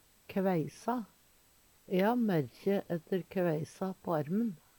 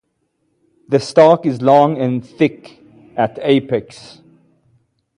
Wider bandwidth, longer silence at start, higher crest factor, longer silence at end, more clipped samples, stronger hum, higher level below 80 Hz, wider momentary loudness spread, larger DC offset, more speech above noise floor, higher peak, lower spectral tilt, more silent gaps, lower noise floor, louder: first, 19 kHz vs 11 kHz; second, 0.3 s vs 0.9 s; about the same, 16 dB vs 16 dB; second, 0.25 s vs 1.35 s; neither; neither; second, -72 dBFS vs -60 dBFS; second, 9 LU vs 12 LU; neither; second, 33 dB vs 53 dB; second, -18 dBFS vs 0 dBFS; about the same, -7.5 dB/octave vs -7 dB/octave; neither; about the same, -65 dBFS vs -67 dBFS; second, -34 LUFS vs -15 LUFS